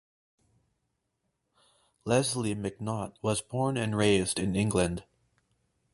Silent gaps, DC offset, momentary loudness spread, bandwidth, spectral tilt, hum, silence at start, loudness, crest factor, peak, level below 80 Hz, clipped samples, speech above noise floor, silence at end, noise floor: none; under 0.1%; 9 LU; 11.5 kHz; -5 dB/octave; none; 2.05 s; -29 LUFS; 22 dB; -10 dBFS; -54 dBFS; under 0.1%; 51 dB; 0.95 s; -80 dBFS